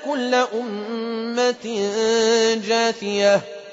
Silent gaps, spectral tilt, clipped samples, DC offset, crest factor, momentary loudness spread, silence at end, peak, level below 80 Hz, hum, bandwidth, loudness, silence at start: none; -3 dB/octave; under 0.1%; under 0.1%; 14 dB; 9 LU; 0 s; -6 dBFS; -68 dBFS; none; 8 kHz; -20 LUFS; 0 s